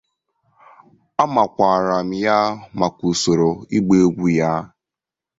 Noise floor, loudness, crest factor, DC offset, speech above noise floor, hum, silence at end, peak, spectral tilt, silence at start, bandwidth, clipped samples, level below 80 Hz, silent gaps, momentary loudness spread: -87 dBFS; -18 LUFS; 18 dB; under 0.1%; 70 dB; none; 0.75 s; -2 dBFS; -5.5 dB/octave; 1.2 s; 8 kHz; under 0.1%; -52 dBFS; none; 7 LU